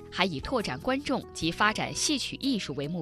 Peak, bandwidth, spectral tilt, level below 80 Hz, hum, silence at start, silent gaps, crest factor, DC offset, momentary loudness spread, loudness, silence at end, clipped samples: -8 dBFS; 13.5 kHz; -3.5 dB/octave; -50 dBFS; none; 0 s; none; 22 dB; under 0.1%; 6 LU; -29 LUFS; 0 s; under 0.1%